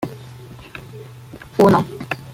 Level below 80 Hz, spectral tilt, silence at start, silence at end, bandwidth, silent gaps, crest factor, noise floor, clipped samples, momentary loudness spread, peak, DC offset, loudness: -50 dBFS; -7 dB/octave; 0 s; 0 s; 16 kHz; none; 20 dB; -39 dBFS; under 0.1%; 24 LU; -2 dBFS; under 0.1%; -18 LUFS